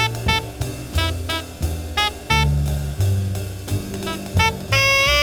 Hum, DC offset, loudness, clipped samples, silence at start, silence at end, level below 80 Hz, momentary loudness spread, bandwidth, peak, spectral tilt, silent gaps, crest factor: none; under 0.1%; -20 LUFS; under 0.1%; 0 s; 0 s; -30 dBFS; 11 LU; over 20 kHz; -4 dBFS; -4 dB/octave; none; 18 dB